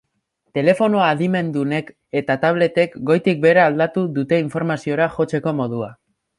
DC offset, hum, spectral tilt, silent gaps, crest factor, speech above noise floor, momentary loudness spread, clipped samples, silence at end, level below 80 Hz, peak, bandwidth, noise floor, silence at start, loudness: under 0.1%; none; -7.5 dB/octave; none; 16 dB; 52 dB; 10 LU; under 0.1%; 0.45 s; -60 dBFS; -2 dBFS; 11.5 kHz; -70 dBFS; 0.55 s; -19 LUFS